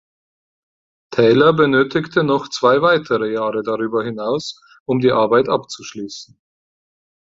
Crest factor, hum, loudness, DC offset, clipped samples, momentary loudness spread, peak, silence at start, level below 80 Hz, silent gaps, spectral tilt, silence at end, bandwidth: 16 dB; none; -17 LUFS; under 0.1%; under 0.1%; 17 LU; -2 dBFS; 1.1 s; -58 dBFS; 4.80-4.86 s; -5.5 dB/octave; 1.15 s; 7.8 kHz